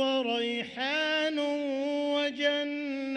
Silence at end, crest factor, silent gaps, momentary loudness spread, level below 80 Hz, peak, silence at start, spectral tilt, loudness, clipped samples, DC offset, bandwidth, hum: 0 s; 14 dB; none; 5 LU; -74 dBFS; -16 dBFS; 0 s; -3 dB/octave; -29 LUFS; under 0.1%; under 0.1%; 9.4 kHz; none